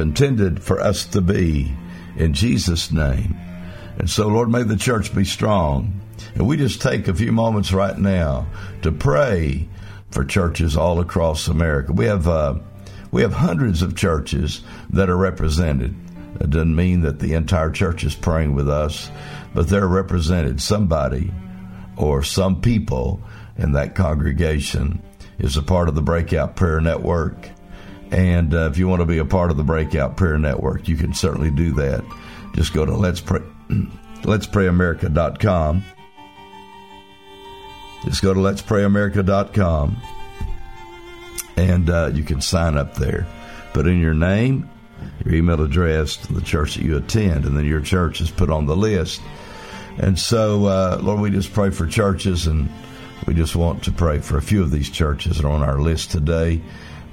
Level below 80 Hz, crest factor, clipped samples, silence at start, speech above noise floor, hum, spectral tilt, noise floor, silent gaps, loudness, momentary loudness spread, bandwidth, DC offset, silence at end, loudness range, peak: -28 dBFS; 18 dB; under 0.1%; 0 s; 25 dB; none; -6.5 dB/octave; -43 dBFS; none; -20 LUFS; 14 LU; 16 kHz; 0.3%; 0 s; 2 LU; 0 dBFS